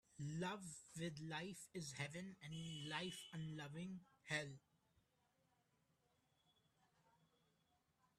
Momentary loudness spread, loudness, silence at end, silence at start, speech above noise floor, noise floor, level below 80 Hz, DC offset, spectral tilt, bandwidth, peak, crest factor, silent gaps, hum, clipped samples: 8 LU; -50 LUFS; 3.6 s; 0.1 s; 32 dB; -83 dBFS; -82 dBFS; under 0.1%; -4.5 dB/octave; 14 kHz; -28 dBFS; 24 dB; none; none; under 0.1%